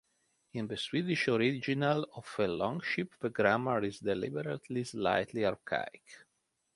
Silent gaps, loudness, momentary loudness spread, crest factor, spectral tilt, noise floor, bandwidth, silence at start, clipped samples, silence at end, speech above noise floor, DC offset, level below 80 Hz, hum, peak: none; -33 LUFS; 9 LU; 22 dB; -6 dB/octave; -80 dBFS; 11.5 kHz; 0.55 s; under 0.1%; 0.6 s; 47 dB; under 0.1%; -68 dBFS; none; -12 dBFS